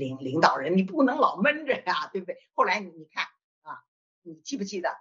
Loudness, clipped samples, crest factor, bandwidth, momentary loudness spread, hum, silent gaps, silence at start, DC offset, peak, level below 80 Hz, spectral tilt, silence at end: -26 LUFS; under 0.1%; 22 dB; 7.6 kHz; 18 LU; none; 3.44-3.62 s, 3.88-4.22 s; 0 s; under 0.1%; -4 dBFS; -78 dBFS; -3.5 dB/octave; 0.05 s